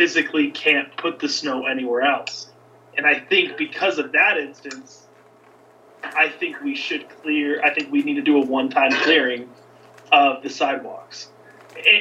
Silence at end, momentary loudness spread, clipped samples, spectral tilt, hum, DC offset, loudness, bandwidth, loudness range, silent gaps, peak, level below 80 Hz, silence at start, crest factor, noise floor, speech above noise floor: 0 s; 17 LU; under 0.1%; -2.5 dB/octave; none; under 0.1%; -19 LUFS; 8.4 kHz; 4 LU; none; -2 dBFS; -82 dBFS; 0 s; 20 dB; -51 dBFS; 30 dB